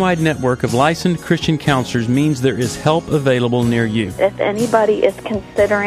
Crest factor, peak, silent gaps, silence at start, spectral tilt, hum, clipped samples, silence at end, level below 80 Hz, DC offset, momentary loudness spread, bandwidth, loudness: 16 dB; 0 dBFS; none; 0 s; -6 dB/octave; none; under 0.1%; 0 s; -42 dBFS; under 0.1%; 3 LU; 15 kHz; -16 LUFS